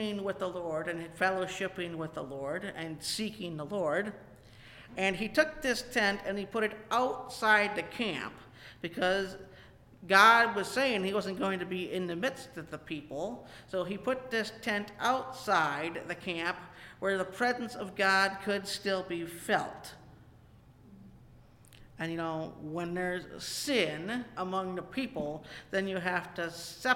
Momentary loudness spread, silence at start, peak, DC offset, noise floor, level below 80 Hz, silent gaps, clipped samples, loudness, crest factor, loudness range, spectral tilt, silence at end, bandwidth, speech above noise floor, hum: 13 LU; 0 s; -8 dBFS; under 0.1%; -58 dBFS; -62 dBFS; none; under 0.1%; -32 LUFS; 24 dB; 9 LU; -4 dB/octave; 0 s; 17 kHz; 25 dB; none